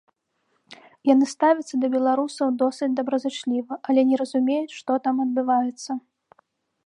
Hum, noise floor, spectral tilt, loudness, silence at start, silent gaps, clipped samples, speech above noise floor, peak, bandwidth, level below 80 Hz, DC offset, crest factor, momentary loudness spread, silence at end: none; -72 dBFS; -4 dB/octave; -23 LUFS; 0.7 s; none; under 0.1%; 50 dB; -6 dBFS; 10.5 kHz; -82 dBFS; under 0.1%; 18 dB; 7 LU; 0.85 s